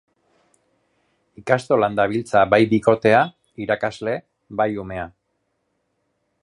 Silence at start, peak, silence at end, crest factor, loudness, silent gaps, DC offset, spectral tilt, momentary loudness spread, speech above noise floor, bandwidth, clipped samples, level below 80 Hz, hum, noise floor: 1.4 s; 0 dBFS; 1.35 s; 20 dB; -20 LUFS; none; under 0.1%; -6.5 dB/octave; 16 LU; 53 dB; 11.5 kHz; under 0.1%; -54 dBFS; none; -72 dBFS